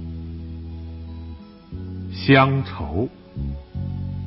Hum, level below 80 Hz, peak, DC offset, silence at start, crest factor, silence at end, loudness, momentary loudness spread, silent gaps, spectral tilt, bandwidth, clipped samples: none; -36 dBFS; -2 dBFS; under 0.1%; 0 s; 22 dB; 0 s; -22 LUFS; 21 LU; none; -11 dB/octave; 5.8 kHz; under 0.1%